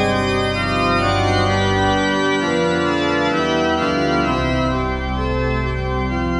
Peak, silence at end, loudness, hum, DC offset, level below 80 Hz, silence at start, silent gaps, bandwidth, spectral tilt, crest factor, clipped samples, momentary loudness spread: -4 dBFS; 0 s; -18 LUFS; none; under 0.1%; -30 dBFS; 0 s; none; 10.5 kHz; -5.5 dB/octave; 14 dB; under 0.1%; 4 LU